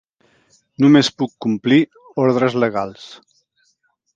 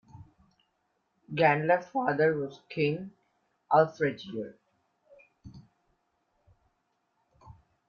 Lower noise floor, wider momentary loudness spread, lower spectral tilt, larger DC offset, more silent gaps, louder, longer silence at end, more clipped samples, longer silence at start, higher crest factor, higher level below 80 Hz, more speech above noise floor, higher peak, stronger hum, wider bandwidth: second, -65 dBFS vs -77 dBFS; about the same, 15 LU vs 14 LU; second, -6 dB/octave vs -7.5 dB/octave; neither; neither; first, -17 LUFS vs -28 LUFS; first, 1 s vs 0.35 s; neither; first, 0.8 s vs 0.15 s; about the same, 18 dB vs 22 dB; first, -62 dBFS vs -68 dBFS; about the same, 49 dB vs 49 dB; first, 0 dBFS vs -10 dBFS; neither; first, 7.8 kHz vs 6.8 kHz